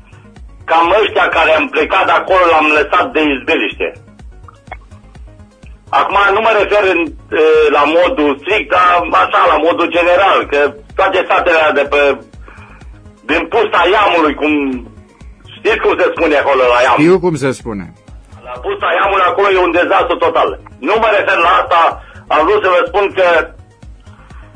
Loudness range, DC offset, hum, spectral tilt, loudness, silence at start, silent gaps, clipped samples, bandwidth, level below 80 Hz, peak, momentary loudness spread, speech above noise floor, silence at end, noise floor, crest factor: 4 LU; under 0.1%; none; -5 dB/octave; -11 LUFS; 0.35 s; none; under 0.1%; 10.5 kHz; -38 dBFS; 0 dBFS; 8 LU; 26 dB; 0.1 s; -37 dBFS; 12 dB